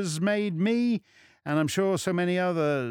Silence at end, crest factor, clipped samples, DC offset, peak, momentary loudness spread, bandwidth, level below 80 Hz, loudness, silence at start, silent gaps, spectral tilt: 0 s; 14 dB; under 0.1%; under 0.1%; -14 dBFS; 4 LU; 19 kHz; -70 dBFS; -27 LUFS; 0 s; none; -5.5 dB/octave